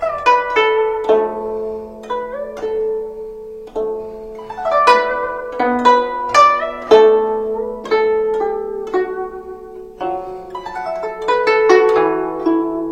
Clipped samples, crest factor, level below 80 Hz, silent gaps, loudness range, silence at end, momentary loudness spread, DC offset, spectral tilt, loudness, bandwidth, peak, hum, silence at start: under 0.1%; 16 dB; -48 dBFS; none; 9 LU; 0 s; 17 LU; under 0.1%; -4 dB/octave; -16 LUFS; 9.4 kHz; 0 dBFS; none; 0 s